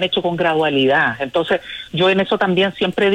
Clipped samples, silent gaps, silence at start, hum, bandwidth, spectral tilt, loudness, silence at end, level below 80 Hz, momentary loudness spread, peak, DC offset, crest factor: under 0.1%; none; 0 s; none; 10.5 kHz; -6 dB/octave; -17 LUFS; 0 s; -54 dBFS; 6 LU; -4 dBFS; under 0.1%; 12 dB